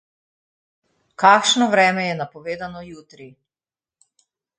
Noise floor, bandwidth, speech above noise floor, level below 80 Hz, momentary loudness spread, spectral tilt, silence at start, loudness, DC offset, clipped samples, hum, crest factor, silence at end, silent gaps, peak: under -90 dBFS; 9.6 kHz; over 71 dB; -66 dBFS; 20 LU; -3 dB/octave; 1.2 s; -17 LUFS; under 0.1%; under 0.1%; none; 22 dB; 1.3 s; none; 0 dBFS